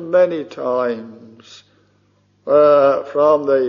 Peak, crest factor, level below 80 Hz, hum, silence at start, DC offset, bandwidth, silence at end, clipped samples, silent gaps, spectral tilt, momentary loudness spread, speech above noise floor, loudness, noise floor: -2 dBFS; 14 dB; -68 dBFS; 50 Hz at -60 dBFS; 0 s; under 0.1%; 7 kHz; 0 s; under 0.1%; none; -4.5 dB/octave; 12 LU; 44 dB; -15 LUFS; -58 dBFS